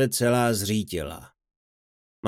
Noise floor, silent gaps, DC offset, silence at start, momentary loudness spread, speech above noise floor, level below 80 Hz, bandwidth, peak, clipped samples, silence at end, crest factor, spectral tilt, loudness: under -90 dBFS; 1.56-2.23 s; under 0.1%; 0 s; 15 LU; over 66 dB; -52 dBFS; 17 kHz; -10 dBFS; under 0.1%; 0 s; 16 dB; -4.5 dB/octave; -24 LUFS